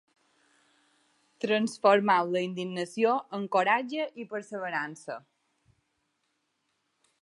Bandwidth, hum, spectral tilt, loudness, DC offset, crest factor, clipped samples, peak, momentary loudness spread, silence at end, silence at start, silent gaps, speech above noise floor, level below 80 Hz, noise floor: 11.5 kHz; none; -5 dB/octave; -28 LUFS; under 0.1%; 22 dB; under 0.1%; -8 dBFS; 14 LU; 2.05 s; 1.45 s; none; 50 dB; -84 dBFS; -78 dBFS